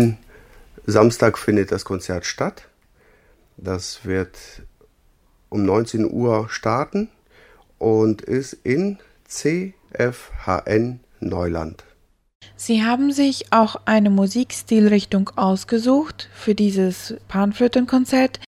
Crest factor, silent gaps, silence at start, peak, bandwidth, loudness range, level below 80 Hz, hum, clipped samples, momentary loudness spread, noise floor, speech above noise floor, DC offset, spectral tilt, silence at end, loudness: 20 dB; 12.35-12.40 s; 0 s; 0 dBFS; 15.5 kHz; 7 LU; -48 dBFS; none; under 0.1%; 12 LU; -58 dBFS; 38 dB; under 0.1%; -6 dB/octave; 0.05 s; -20 LUFS